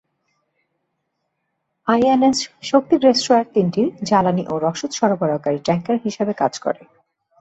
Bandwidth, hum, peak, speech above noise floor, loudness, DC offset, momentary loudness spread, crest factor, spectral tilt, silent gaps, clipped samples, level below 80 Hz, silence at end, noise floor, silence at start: 8.2 kHz; none; -2 dBFS; 56 dB; -18 LUFS; under 0.1%; 8 LU; 18 dB; -5.5 dB/octave; none; under 0.1%; -60 dBFS; 0.65 s; -74 dBFS; 1.85 s